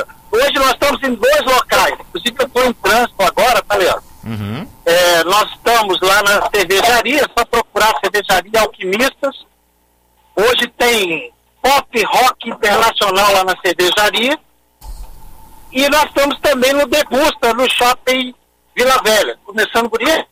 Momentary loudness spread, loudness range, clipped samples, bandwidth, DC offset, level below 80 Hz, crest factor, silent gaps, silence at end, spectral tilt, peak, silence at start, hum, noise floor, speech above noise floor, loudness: 8 LU; 3 LU; under 0.1%; 16 kHz; under 0.1%; -40 dBFS; 14 dB; none; 0.05 s; -2 dB/octave; -2 dBFS; 0 s; none; -57 dBFS; 43 dB; -13 LUFS